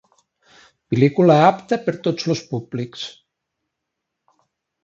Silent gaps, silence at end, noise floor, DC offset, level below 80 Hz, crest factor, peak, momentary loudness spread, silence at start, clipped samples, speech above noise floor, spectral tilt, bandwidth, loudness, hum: none; 1.75 s; -80 dBFS; under 0.1%; -62 dBFS; 20 dB; 0 dBFS; 16 LU; 0.9 s; under 0.1%; 62 dB; -7 dB/octave; 7.8 kHz; -19 LUFS; none